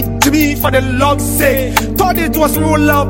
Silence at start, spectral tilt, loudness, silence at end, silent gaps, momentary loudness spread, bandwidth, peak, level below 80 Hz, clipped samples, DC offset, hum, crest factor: 0 s; -4.5 dB/octave; -12 LUFS; 0 s; none; 2 LU; 17 kHz; 0 dBFS; -24 dBFS; under 0.1%; under 0.1%; none; 12 dB